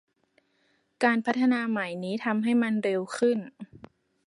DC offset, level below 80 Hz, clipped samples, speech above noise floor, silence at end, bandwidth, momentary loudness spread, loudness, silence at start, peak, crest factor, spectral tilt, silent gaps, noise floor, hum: under 0.1%; -74 dBFS; under 0.1%; 44 dB; 0.6 s; 11.5 kHz; 9 LU; -27 LUFS; 1 s; -8 dBFS; 20 dB; -6 dB/octave; none; -70 dBFS; none